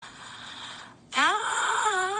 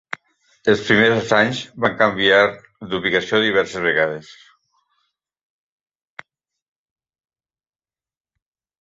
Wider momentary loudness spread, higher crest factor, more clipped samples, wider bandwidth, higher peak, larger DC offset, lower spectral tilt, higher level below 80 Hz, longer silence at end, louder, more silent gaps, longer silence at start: first, 18 LU vs 13 LU; about the same, 16 dB vs 20 dB; neither; first, 10 kHz vs 8 kHz; second, -12 dBFS vs -2 dBFS; neither; second, 0 dB/octave vs -4.5 dB/octave; second, -70 dBFS vs -56 dBFS; second, 0 s vs 4.6 s; second, -25 LUFS vs -17 LUFS; neither; second, 0 s vs 0.65 s